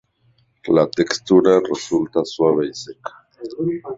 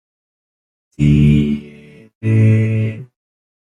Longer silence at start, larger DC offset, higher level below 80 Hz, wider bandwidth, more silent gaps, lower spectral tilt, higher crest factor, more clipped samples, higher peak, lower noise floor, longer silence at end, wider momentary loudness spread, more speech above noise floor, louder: second, 0.65 s vs 1 s; neither; second, -58 dBFS vs -34 dBFS; second, 7.8 kHz vs 8.8 kHz; second, none vs 2.15-2.21 s; second, -5.5 dB/octave vs -9 dB/octave; about the same, 18 dB vs 14 dB; neither; about the same, -2 dBFS vs -2 dBFS; first, -60 dBFS vs -40 dBFS; second, 0 s vs 0.65 s; first, 20 LU vs 13 LU; first, 42 dB vs 29 dB; second, -18 LUFS vs -15 LUFS